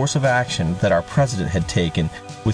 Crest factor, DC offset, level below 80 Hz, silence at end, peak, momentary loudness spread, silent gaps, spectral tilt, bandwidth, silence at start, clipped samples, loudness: 12 dB; under 0.1%; -38 dBFS; 0 s; -8 dBFS; 6 LU; none; -5.5 dB/octave; 10.5 kHz; 0 s; under 0.1%; -20 LUFS